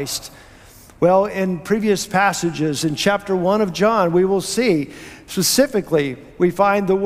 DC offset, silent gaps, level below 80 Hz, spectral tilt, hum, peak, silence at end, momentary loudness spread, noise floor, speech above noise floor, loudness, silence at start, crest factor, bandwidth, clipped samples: under 0.1%; none; -50 dBFS; -4.5 dB/octave; none; -4 dBFS; 0 s; 9 LU; -44 dBFS; 26 dB; -18 LUFS; 0 s; 16 dB; 16 kHz; under 0.1%